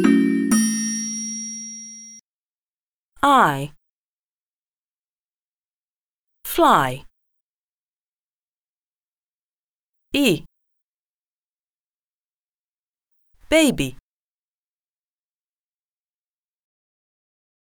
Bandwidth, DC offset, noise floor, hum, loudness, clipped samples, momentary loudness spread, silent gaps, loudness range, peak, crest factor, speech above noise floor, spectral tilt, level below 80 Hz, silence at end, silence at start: over 20 kHz; under 0.1%; under -90 dBFS; none; -19 LUFS; under 0.1%; 19 LU; 2.21-3.12 s, 3.90-6.28 s, 7.41-9.94 s, 10.82-12.94 s; 5 LU; -2 dBFS; 24 dB; over 72 dB; -3.5 dB/octave; -52 dBFS; 3.75 s; 0 s